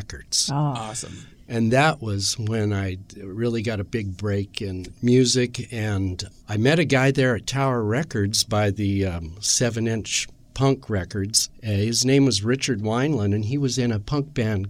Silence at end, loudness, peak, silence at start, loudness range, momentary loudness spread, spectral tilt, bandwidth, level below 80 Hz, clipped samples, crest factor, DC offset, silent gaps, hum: 0 s; -23 LUFS; -4 dBFS; 0 s; 3 LU; 11 LU; -4.5 dB/octave; 16 kHz; -48 dBFS; under 0.1%; 20 dB; under 0.1%; none; none